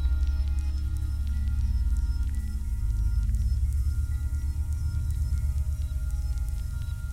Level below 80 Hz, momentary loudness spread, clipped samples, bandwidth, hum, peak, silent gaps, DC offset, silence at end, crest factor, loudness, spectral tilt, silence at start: -28 dBFS; 4 LU; under 0.1%; 13.5 kHz; none; -16 dBFS; none; under 0.1%; 0 s; 12 dB; -30 LUFS; -6.5 dB/octave; 0 s